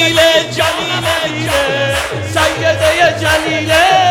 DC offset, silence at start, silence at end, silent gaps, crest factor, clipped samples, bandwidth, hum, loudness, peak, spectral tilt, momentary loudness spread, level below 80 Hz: under 0.1%; 0 s; 0 s; none; 12 dB; under 0.1%; 17.5 kHz; none; -12 LUFS; 0 dBFS; -3.5 dB/octave; 6 LU; -38 dBFS